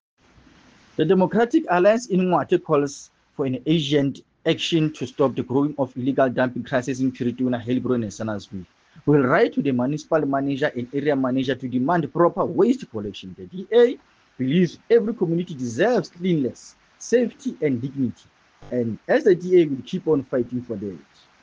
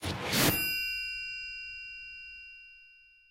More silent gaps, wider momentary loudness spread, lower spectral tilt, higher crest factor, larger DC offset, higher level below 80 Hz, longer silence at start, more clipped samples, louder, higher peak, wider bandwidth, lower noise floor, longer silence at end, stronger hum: neither; second, 11 LU vs 21 LU; first, -6.5 dB/octave vs -2.5 dB/octave; about the same, 18 dB vs 22 dB; neither; second, -62 dBFS vs -56 dBFS; first, 1 s vs 0 s; neither; first, -22 LUFS vs -31 LUFS; first, -4 dBFS vs -12 dBFS; second, 9.4 kHz vs 16 kHz; second, -53 dBFS vs -59 dBFS; first, 0.45 s vs 0.25 s; neither